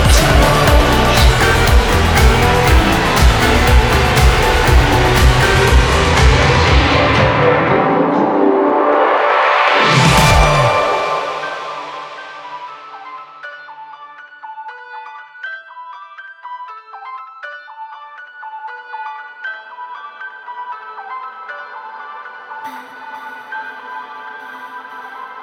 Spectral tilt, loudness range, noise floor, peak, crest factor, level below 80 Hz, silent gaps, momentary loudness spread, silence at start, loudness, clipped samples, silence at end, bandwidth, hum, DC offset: -4.5 dB/octave; 20 LU; -36 dBFS; 0 dBFS; 14 dB; -20 dBFS; none; 21 LU; 0 s; -12 LUFS; under 0.1%; 0 s; over 20 kHz; none; under 0.1%